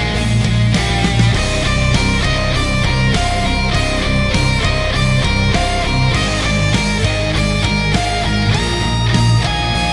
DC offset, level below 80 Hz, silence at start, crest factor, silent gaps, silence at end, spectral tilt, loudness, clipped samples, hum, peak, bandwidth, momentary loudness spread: under 0.1%; -22 dBFS; 0 s; 14 dB; none; 0 s; -5 dB/octave; -15 LUFS; under 0.1%; none; 0 dBFS; 11.5 kHz; 2 LU